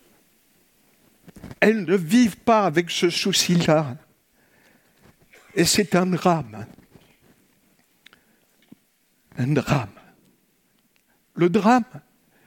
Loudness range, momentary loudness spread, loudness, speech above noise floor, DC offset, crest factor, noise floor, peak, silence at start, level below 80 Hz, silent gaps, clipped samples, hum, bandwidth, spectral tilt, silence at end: 10 LU; 19 LU; -20 LUFS; 45 dB; under 0.1%; 22 dB; -65 dBFS; -2 dBFS; 1.35 s; -58 dBFS; none; under 0.1%; none; 17 kHz; -4.5 dB/octave; 0.5 s